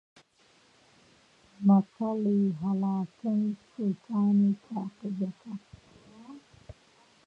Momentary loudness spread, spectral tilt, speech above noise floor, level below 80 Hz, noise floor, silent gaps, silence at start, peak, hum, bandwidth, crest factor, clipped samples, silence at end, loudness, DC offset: 20 LU; -10 dB/octave; 36 dB; -68 dBFS; -64 dBFS; none; 1.6 s; -14 dBFS; none; 5.4 kHz; 18 dB; under 0.1%; 0.55 s; -29 LUFS; under 0.1%